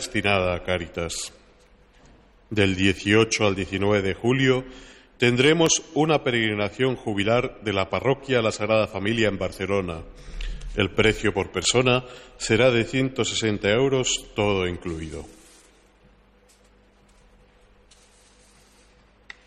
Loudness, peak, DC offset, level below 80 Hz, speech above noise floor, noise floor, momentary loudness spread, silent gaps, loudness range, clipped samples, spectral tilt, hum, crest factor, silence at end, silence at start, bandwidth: -23 LUFS; -6 dBFS; under 0.1%; -44 dBFS; 34 dB; -57 dBFS; 13 LU; none; 4 LU; under 0.1%; -4 dB/octave; 50 Hz at -50 dBFS; 18 dB; 4.15 s; 0 s; 14.5 kHz